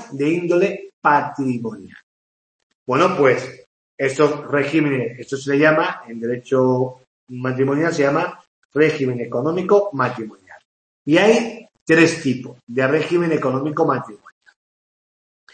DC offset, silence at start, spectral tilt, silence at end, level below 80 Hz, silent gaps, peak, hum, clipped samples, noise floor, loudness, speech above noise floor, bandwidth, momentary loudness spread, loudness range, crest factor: under 0.1%; 0 s; -6 dB/octave; 1.4 s; -66 dBFS; 0.93-1.02 s, 2.03-2.86 s, 3.66-3.98 s, 7.07-7.27 s, 8.47-8.70 s, 10.65-11.05 s, 11.81-11.86 s, 12.63-12.67 s; 0 dBFS; none; under 0.1%; under -90 dBFS; -19 LUFS; over 72 dB; 8.8 kHz; 13 LU; 3 LU; 18 dB